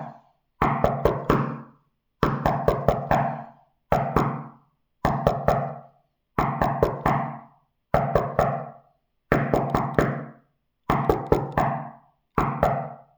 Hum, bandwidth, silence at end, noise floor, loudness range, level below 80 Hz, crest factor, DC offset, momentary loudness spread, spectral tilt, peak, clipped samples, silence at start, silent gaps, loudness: none; over 20 kHz; 0.15 s; -66 dBFS; 1 LU; -40 dBFS; 24 dB; under 0.1%; 12 LU; -8 dB/octave; -2 dBFS; under 0.1%; 0 s; none; -25 LUFS